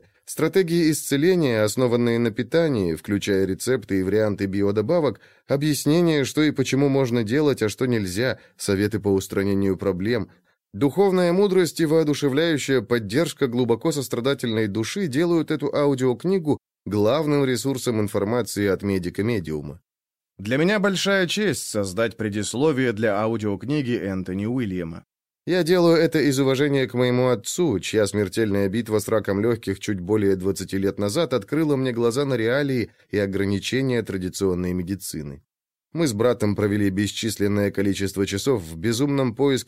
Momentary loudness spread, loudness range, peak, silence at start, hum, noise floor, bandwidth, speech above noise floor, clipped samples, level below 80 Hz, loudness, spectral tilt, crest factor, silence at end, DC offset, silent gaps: 6 LU; 3 LU; -8 dBFS; 0.3 s; none; under -90 dBFS; 16 kHz; over 68 dB; under 0.1%; -56 dBFS; -22 LUFS; -5.5 dB/octave; 14 dB; 0.05 s; under 0.1%; none